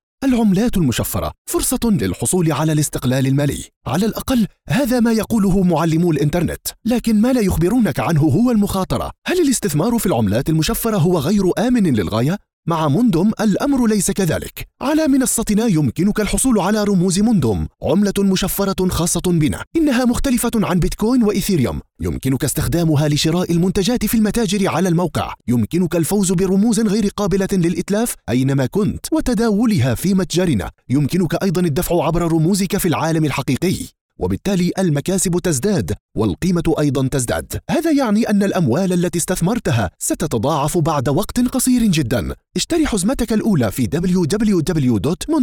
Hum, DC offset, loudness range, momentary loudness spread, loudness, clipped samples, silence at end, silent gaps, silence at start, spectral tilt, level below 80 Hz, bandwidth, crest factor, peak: none; under 0.1%; 2 LU; 5 LU; -17 LUFS; under 0.1%; 0 s; 1.38-1.45 s, 3.76-3.81 s, 9.18-9.22 s, 12.53-12.63 s, 19.67-19.71 s, 34.01-34.09 s, 36.00-36.09 s; 0.2 s; -5.5 dB/octave; -34 dBFS; over 20 kHz; 12 dB; -4 dBFS